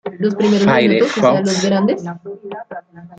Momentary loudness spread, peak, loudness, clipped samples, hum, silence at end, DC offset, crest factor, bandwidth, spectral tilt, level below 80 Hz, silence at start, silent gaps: 18 LU; -2 dBFS; -15 LUFS; under 0.1%; none; 0.05 s; under 0.1%; 14 dB; 9.2 kHz; -5.5 dB/octave; -56 dBFS; 0.05 s; none